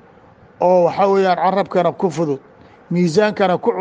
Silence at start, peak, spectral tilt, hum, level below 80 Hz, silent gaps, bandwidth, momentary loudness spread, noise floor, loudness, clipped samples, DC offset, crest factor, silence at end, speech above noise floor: 0.6 s; -2 dBFS; -6.5 dB/octave; none; -60 dBFS; none; 9.4 kHz; 8 LU; -46 dBFS; -16 LUFS; under 0.1%; under 0.1%; 14 dB; 0 s; 31 dB